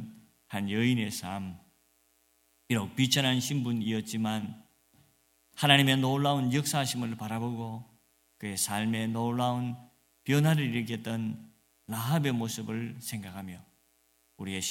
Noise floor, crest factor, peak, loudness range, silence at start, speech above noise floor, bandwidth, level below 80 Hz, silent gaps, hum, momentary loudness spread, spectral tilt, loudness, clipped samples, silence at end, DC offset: -69 dBFS; 26 dB; -6 dBFS; 6 LU; 0 s; 40 dB; 17 kHz; -70 dBFS; none; none; 17 LU; -4.5 dB/octave; -30 LUFS; under 0.1%; 0 s; under 0.1%